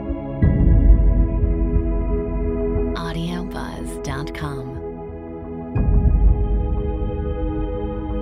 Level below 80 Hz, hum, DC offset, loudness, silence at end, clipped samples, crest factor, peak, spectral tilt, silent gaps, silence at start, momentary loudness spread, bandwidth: -20 dBFS; none; under 0.1%; -22 LUFS; 0 s; under 0.1%; 16 dB; -2 dBFS; -8.5 dB/octave; none; 0 s; 13 LU; 10.5 kHz